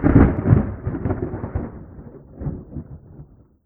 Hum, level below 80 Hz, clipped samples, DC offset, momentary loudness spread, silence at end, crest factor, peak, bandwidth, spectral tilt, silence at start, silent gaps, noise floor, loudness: none; -30 dBFS; under 0.1%; under 0.1%; 25 LU; 0.45 s; 22 dB; 0 dBFS; 3.2 kHz; -13.5 dB/octave; 0 s; none; -45 dBFS; -21 LUFS